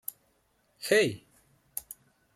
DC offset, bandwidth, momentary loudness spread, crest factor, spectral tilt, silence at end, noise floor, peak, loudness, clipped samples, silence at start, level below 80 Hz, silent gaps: under 0.1%; 16.5 kHz; 23 LU; 22 dB; -3.5 dB/octave; 0.55 s; -71 dBFS; -10 dBFS; -30 LUFS; under 0.1%; 0.8 s; -72 dBFS; none